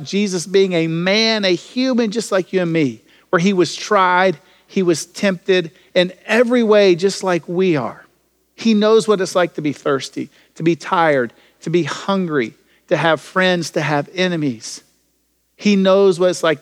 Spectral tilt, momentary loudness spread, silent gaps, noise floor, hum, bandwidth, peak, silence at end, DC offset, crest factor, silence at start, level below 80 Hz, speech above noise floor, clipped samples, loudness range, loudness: -5 dB/octave; 9 LU; none; -64 dBFS; none; 14 kHz; 0 dBFS; 0.05 s; under 0.1%; 16 dB; 0 s; -70 dBFS; 48 dB; under 0.1%; 3 LU; -17 LUFS